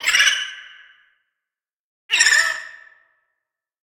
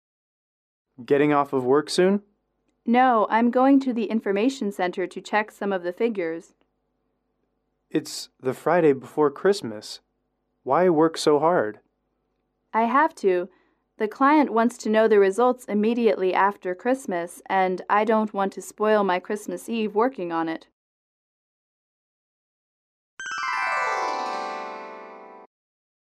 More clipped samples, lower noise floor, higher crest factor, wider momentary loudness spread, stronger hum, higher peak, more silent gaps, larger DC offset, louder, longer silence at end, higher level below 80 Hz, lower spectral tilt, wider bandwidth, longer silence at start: neither; first, -88 dBFS vs -74 dBFS; first, 22 dB vs 16 dB; first, 21 LU vs 12 LU; neither; first, 0 dBFS vs -8 dBFS; second, 1.80-2.09 s vs 20.73-23.17 s; neither; first, -16 LUFS vs -23 LUFS; first, 1.1 s vs 0.75 s; first, -64 dBFS vs -76 dBFS; second, 4.5 dB/octave vs -5.5 dB/octave; first, 17.5 kHz vs 14 kHz; second, 0 s vs 1 s